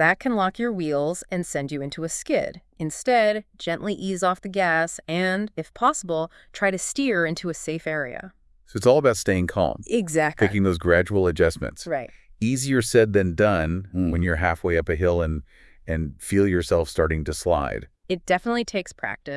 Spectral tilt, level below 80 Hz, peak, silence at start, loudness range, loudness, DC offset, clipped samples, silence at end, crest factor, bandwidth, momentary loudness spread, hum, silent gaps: -5 dB/octave; -44 dBFS; -4 dBFS; 0 s; 4 LU; -23 LUFS; under 0.1%; under 0.1%; 0 s; 20 dB; 12 kHz; 11 LU; none; none